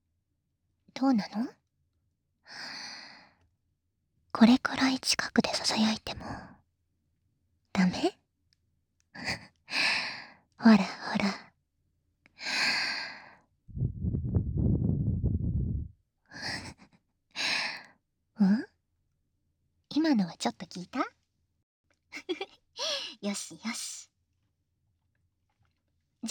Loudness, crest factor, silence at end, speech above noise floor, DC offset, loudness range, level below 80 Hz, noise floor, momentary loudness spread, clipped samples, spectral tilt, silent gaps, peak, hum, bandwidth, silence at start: -30 LUFS; 24 dB; 0 s; 51 dB; under 0.1%; 9 LU; -48 dBFS; -79 dBFS; 18 LU; under 0.1%; -4.5 dB/octave; 21.63-21.84 s; -8 dBFS; none; 19.5 kHz; 0.95 s